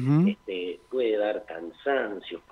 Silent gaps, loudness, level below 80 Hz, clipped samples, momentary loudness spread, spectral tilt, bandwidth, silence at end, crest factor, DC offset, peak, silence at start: none; -28 LUFS; -68 dBFS; under 0.1%; 11 LU; -9 dB/octave; 6 kHz; 0.1 s; 14 dB; under 0.1%; -14 dBFS; 0 s